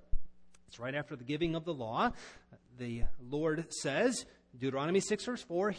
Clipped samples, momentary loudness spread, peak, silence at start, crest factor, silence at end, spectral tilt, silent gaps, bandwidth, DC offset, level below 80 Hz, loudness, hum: under 0.1%; 16 LU; -18 dBFS; 0.15 s; 16 dB; 0 s; -4.5 dB/octave; none; 10.5 kHz; under 0.1%; -46 dBFS; -36 LUFS; none